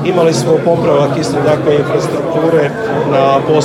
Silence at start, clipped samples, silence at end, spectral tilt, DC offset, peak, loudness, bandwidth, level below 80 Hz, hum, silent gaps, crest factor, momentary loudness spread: 0 s; under 0.1%; 0 s; -6 dB/octave; under 0.1%; 0 dBFS; -12 LUFS; 15.5 kHz; -46 dBFS; none; none; 10 dB; 4 LU